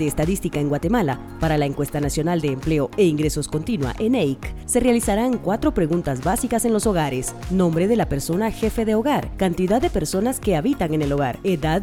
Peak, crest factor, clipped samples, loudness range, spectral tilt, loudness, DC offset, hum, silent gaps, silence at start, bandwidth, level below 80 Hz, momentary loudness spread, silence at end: -4 dBFS; 16 dB; under 0.1%; 1 LU; -6 dB/octave; -21 LUFS; under 0.1%; none; none; 0 s; 18 kHz; -36 dBFS; 5 LU; 0 s